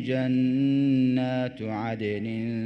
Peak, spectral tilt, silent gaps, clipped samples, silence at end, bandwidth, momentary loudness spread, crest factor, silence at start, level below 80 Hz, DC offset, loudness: -14 dBFS; -9 dB/octave; none; under 0.1%; 0 s; 6 kHz; 8 LU; 10 dB; 0 s; -64 dBFS; under 0.1%; -26 LUFS